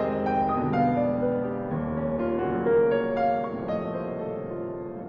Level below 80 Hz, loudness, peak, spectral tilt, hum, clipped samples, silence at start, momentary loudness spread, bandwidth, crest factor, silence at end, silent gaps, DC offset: -52 dBFS; -27 LUFS; -12 dBFS; -10 dB/octave; none; under 0.1%; 0 s; 10 LU; 5.4 kHz; 14 dB; 0 s; none; under 0.1%